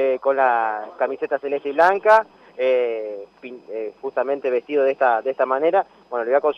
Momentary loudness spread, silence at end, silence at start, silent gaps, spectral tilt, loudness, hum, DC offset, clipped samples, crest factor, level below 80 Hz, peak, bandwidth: 14 LU; 0 s; 0 s; none; -5 dB/octave; -20 LUFS; none; under 0.1%; under 0.1%; 16 dB; -72 dBFS; -4 dBFS; 7 kHz